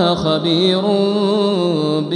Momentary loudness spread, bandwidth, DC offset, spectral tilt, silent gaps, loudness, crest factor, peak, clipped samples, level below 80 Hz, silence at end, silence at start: 2 LU; 10 kHz; under 0.1%; -6.5 dB/octave; none; -16 LUFS; 14 dB; -2 dBFS; under 0.1%; -52 dBFS; 0 s; 0 s